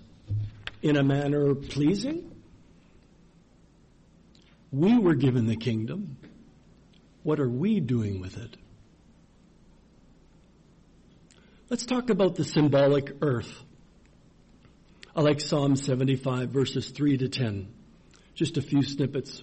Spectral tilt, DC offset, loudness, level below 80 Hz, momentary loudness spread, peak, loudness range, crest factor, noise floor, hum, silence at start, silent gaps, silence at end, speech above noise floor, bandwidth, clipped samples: -7 dB/octave; under 0.1%; -27 LUFS; -56 dBFS; 14 LU; -14 dBFS; 6 LU; 14 dB; -58 dBFS; none; 0.25 s; none; 0 s; 33 dB; 8.4 kHz; under 0.1%